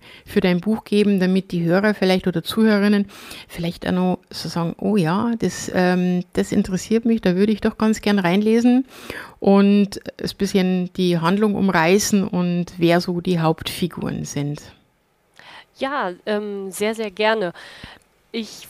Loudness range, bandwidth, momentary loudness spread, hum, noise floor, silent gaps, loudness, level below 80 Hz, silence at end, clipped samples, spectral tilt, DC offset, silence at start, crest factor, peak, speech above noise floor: 7 LU; 15.5 kHz; 12 LU; none; -63 dBFS; none; -20 LUFS; -50 dBFS; 0 s; under 0.1%; -6 dB/octave; under 0.1%; 0.1 s; 16 dB; -4 dBFS; 43 dB